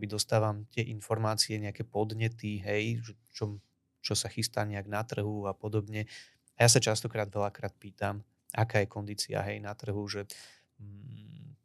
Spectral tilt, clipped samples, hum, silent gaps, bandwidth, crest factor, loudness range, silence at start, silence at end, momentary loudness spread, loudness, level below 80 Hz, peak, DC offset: -4 dB/octave; under 0.1%; none; none; 14 kHz; 26 dB; 5 LU; 0 s; 0.1 s; 17 LU; -32 LUFS; -68 dBFS; -8 dBFS; under 0.1%